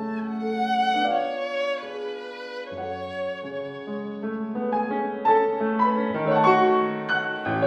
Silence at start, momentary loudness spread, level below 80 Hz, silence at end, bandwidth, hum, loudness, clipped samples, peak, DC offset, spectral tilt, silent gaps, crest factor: 0 s; 13 LU; -70 dBFS; 0 s; 8.6 kHz; none; -25 LUFS; under 0.1%; -6 dBFS; under 0.1%; -6.5 dB/octave; none; 18 dB